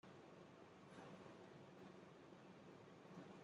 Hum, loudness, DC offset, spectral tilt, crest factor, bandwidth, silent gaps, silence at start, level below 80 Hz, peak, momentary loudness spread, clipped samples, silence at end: none; -62 LUFS; under 0.1%; -6 dB/octave; 16 dB; 10 kHz; none; 0.05 s; under -90 dBFS; -46 dBFS; 3 LU; under 0.1%; 0 s